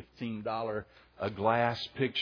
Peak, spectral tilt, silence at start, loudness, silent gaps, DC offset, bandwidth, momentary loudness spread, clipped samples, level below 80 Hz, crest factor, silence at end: -14 dBFS; -6.5 dB/octave; 0 s; -33 LUFS; none; under 0.1%; 5.4 kHz; 11 LU; under 0.1%; -66 dBFS; 20 dB; 0 s